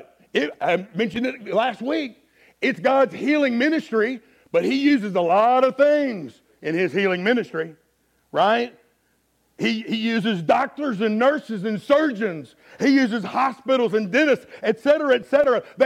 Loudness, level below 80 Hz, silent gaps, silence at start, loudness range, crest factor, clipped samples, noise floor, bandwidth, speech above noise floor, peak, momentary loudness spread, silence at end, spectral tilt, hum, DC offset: -21 LUFS; -68 dBFS; none; 0.35 s; 4 LU; 16 dB; under 0.1%; -66 dBFS; 12.5 kHz; 45 dB; -6 dBFS; 9 LU; 0 s; -6 dB/octave; none; under 0.1%